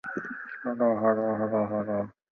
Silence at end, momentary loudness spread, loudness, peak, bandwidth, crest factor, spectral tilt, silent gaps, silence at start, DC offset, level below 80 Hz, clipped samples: 0.25 s; 11 LU; -28 LUFS; -12 dBFS; 6.2 kHz; 16 dB; -10 dB/octave; none; 0.05 s; under 0.1%; -68 dBFS; under 0.1%